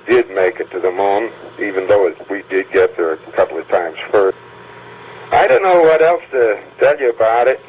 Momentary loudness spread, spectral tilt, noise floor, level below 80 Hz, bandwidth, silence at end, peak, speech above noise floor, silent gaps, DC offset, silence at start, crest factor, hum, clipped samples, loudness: 11 LU; -8.5 dB/octave; -37 dBFS; -54 dBFS; 4 kHz; 0.1 s; -2 dBFS; 22 dB; none; under 0.1%; 0.05 s; 14 dB; none; under 0.1%; -15 LUFS